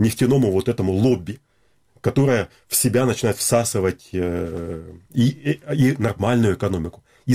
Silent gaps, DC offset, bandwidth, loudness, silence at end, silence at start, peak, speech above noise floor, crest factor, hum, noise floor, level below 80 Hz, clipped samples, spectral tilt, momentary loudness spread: none; under 0.1%; 16.5 kHz; -20 LUFS; 0 s; 0 s; -2 dBFS; 40 dB; 18 dB; none; -60 dBFS; -46 dBFS; under 0.1%; -5.5 dB/octave; 11 LU